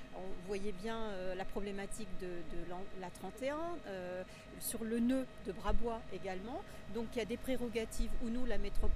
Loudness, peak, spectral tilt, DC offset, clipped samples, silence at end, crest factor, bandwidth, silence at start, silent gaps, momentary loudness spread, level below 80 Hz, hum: -42 LUFS; -18 dBFS; -5 dB/octave; under 0.1%; under 0.1%; 0 s; 18 dB; 14 kHz; 0 s; none; 8 LU; -44 dBFS; none